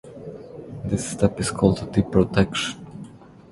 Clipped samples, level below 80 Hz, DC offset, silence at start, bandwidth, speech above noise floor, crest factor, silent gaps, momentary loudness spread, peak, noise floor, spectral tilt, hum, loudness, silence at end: under 0.1%; -42 dBFS; under 0.1%; 0.05 s; 11.5 kHz; 22 dB; 22 dB; none; 19 LU; -2 dBFS; -43 dBFS; -5.5 dB/octave; none; -22 LUFS; 0.25 s